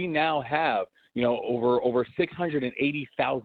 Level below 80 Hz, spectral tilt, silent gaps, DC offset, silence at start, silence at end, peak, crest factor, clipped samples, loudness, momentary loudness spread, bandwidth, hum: -64 dBFS; -8.5 dB/octave; none; under 0.1%; 0 s; 0 s; -12 dBFS; 16 dB; under 0.1%; -27 LUFS; 4 LU; 4.7 kHz; none